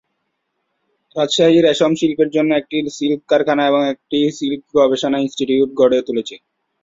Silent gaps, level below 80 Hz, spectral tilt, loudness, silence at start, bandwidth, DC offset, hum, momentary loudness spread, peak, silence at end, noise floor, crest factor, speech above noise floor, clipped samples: none; -58 dBFS; -5 dB/octave; -16 LUFS; 1.15 s; 7.8 kHz; under 0.1%; none; 10 LU; -2 dBFS; 0.45 s; -72 dBFS; 14 dB; 56 dB; under 0.1%